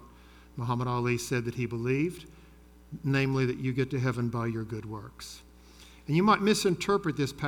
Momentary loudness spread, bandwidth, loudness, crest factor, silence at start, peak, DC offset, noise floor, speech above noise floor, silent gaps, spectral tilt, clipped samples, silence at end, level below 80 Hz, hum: 20 LU; 18.5 kHz; -29 LUFS; 20 dB; 0 s; -10 dBFS; under 0.1%; -54 dBFS; 25 dB; none; -6 dB/octave; under 0.1%; 0 s; -56 dBFS; none